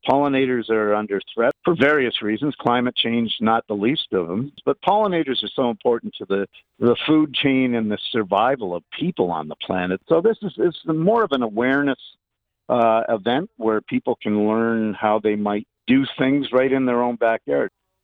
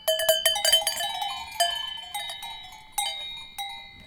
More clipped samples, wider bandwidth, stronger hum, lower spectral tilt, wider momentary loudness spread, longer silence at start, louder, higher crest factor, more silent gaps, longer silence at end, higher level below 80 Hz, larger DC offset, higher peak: neither; second, 4.9 kHz vs over 20 kHz; neither; first, -8 dB/octave vs 1.5 dB/octave; second, 7 LU vs 15 LU; about the same, 0.05 s vs 0 s; first, -21 LUFS vs -25 LUFS; second, 16 dB vs 22 dB; neither; first, 0.35 s vs 0 s; about the same, -60 dBFS vs -58 dBFS; neither; about the same, -4 dBFS vs -6 dBFS